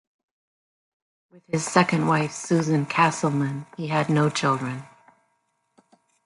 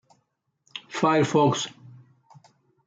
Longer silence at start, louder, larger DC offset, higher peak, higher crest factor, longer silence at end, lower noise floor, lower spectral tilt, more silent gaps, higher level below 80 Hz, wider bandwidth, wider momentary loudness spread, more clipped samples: first, 1.5 s vs 0.75 s; about the same, -23 LUFS vs -23 LUFS; neither; first, -4 dBFS vs -8 dBFS; about the same, 22 dB vs 18 dB; first, 1.4 s vs 0.95 s; about the same, -72 dBFS vs -74 dBFS; about the same, -5.5 dB/octave vs -5 dB/octave; neither; first, -66 dBFS vs -72 dBFS; first, 11.5 kHz vs 9.4 kHz; second, 9 LU vs 19 LU; neither